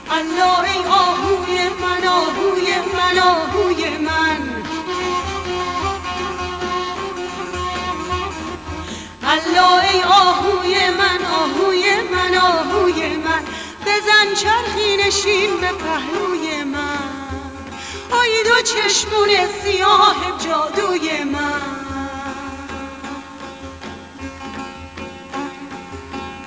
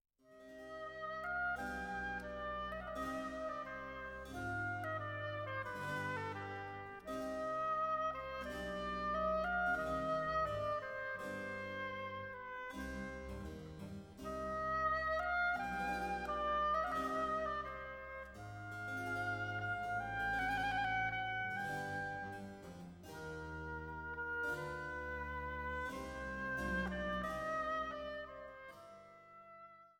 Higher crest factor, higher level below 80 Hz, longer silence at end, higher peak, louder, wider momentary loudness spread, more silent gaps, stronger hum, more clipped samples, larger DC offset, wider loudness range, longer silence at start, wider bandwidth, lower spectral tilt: about the same, 16 dB vs 16 dB; first, -40 dBFS vs -58 dBFS; about the same, 0 s vs 0.05 s; first, -2 dBFS vs -26 dBFS; first, -17 LUFS vs -41 LUFS; first, 17 LU vs 13 LU; neither; neither; neither; neither; first, 11 LU vs 6 LU; second, 0 s vs 0.25 s; second, 8 kHz vs 17 kHz; second, -2.5 dB/octave vs -5.5 dB/octave